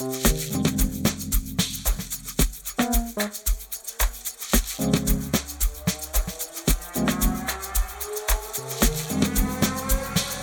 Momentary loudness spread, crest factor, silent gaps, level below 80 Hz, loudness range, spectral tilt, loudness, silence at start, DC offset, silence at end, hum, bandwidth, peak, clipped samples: 5 LU; 20 dB; none; -28 dBFS; 1 LU; -3.5 dB/octave; -25 LUFS; 0 s; under 0.1%; 0 s; none; 19.5 kHz; -4 dBFS; under 0.1%